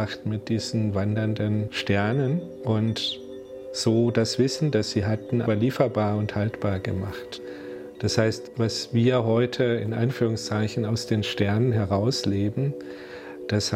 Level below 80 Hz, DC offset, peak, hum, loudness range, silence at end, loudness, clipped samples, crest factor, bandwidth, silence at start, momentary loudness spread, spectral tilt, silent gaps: -56 dBFS; under 0.1%; -4 dBFS; none; 2 LU; 0 s; -25 LUFS; under 0.1%; 20 dB; 13.5 kHz; 0 s; 13 LU; -6 dB/octave; none